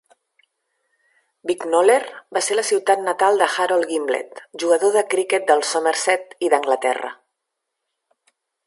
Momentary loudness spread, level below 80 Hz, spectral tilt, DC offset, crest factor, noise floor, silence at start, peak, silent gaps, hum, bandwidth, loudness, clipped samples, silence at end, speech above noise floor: 9 LU; -78 dBFS; -1.5 dB/octave; under 0.1%; 20 dB; -80 dBFS; 1.45 s; -2 dBFS; none; none; 11.5 kHz; -19 LUFS; under 0.1%; 1.5 s; 61 dB